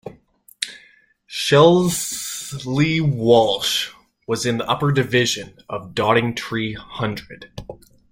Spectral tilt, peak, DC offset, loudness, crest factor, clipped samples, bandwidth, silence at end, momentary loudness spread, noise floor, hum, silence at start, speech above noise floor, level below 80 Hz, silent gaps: -4.5 dB/octave; -2 dBFS; under 0.1%; -19 LUFS; 18 dB; under 0.1%; 16.5 kHz; 0.35 s; 18 LU; -54 dBFS; none; 0.05 s; 35 dB; -52 dBFS; none